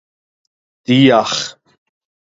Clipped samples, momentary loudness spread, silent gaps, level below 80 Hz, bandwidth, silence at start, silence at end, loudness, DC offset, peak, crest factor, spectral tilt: under 0.1%; 17 LU; none; -60 dBFS; 7.8 kHz; 0.9 s; 0.8 s; -13 LUFS; under 0.1%; 0 dBFS; 18 dB; -5 dB/octave